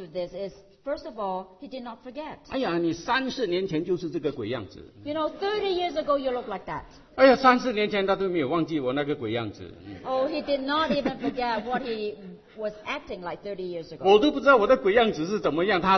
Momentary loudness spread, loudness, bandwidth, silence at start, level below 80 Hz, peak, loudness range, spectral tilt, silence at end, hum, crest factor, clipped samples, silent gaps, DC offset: 19 LU; -26 LUFS; 6.4 kHz; 0 s; -56 dBFS; -4 dBFS; 6 LU; -6 dB/octave; 0 s; none; 22 dB; under 0.1%; none; under 0.1%